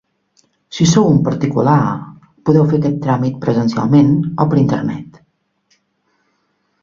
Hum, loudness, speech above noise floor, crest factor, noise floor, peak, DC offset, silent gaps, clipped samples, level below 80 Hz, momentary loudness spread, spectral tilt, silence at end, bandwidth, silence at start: none; -14 LUFS; 51 dB; 16 dB; -64 dBFS; 0 dBFS; under 0.1%; none; under 0.1%; -48 dBFS; 10 LU; -7 dB/octave; 1.75 s; 7.6 kHz; 0.7 s